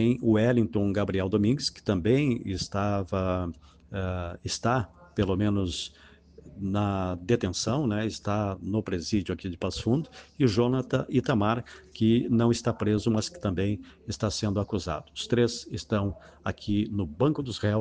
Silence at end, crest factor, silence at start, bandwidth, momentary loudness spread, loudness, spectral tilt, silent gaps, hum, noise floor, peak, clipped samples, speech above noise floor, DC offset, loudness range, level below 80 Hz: 0 s; 18 dB; 0 s; 9.8 kHz; 10 LU; -28 LUFS; -6 dB/octave; none; none; -51 dBFS; -10 dBFS; under 0.1%; 24 dB; under 0.1%; 4 LU; -50 dBFS